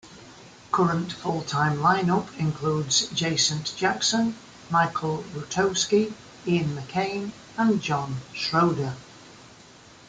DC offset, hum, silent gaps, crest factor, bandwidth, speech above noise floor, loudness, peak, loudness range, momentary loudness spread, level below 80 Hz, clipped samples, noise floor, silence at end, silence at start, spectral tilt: under 0.1%; none; none; 18 dB; 9.6 kHz; 25 dB; -25 LUFS; -8 dBFS; 3 LU; 9 LU; -60 dBFS; under 0.1%; -50 dBFS; 0.55 s; 0.05 s; -4 dB/octave